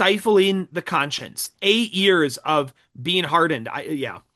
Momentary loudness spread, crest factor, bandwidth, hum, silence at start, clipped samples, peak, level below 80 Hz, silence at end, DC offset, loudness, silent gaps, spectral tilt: 11 LU; 18 dB; 12.5 kHz; none; 0 s; under 0.1%; -4 dBFS; -68 dBFS; 0.15 s; under 0.1%; -21 LUFS; none; -4 dB/octave